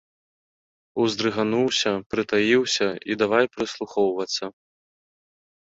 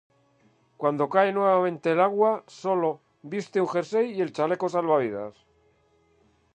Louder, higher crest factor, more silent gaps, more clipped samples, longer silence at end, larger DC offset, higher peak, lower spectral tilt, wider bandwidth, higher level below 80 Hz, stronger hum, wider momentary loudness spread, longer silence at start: about the same, -23 LUFS vs -25 LUFS; about the same, 18 dB vs 20 dB; first, 2.06-2.10 s vs none; neither; about the same, 1.25 s vs 1.25 s; neither; about the same, -6 dBFS vs -6 dBFS; second, -3.5 dB/octave vs -6.5 dB/octave; second, 8 kHz vs 9.4 kHz; first, -64 dBFS vs -76 dBFS; neither; about the same, 9 LU vs 11 LU; first, 0.95 s vs 0.8 s